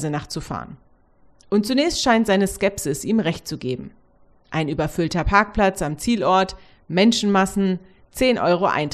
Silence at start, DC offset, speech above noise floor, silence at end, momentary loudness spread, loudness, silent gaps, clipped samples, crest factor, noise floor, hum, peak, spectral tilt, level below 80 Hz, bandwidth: 0 s; under 0.1%; 35 dB; 0 s; 12 LU; -20 LUFS; none; under 0.1%; 20 dB; -55 dBFS; none; 0 dBFS; -5 dB/octave; -40 dBFS; 13.5 kHz